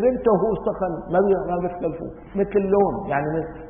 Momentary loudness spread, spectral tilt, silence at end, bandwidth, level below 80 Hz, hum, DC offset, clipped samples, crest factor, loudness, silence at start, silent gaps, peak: 9 LU; -13 dB/octave; 0 s; 3.6 kHz; -44 dBFS; none; under 0.1%; under 0.1%; 16 dB; -22 LUFS; 0 s; none; -6 dBFS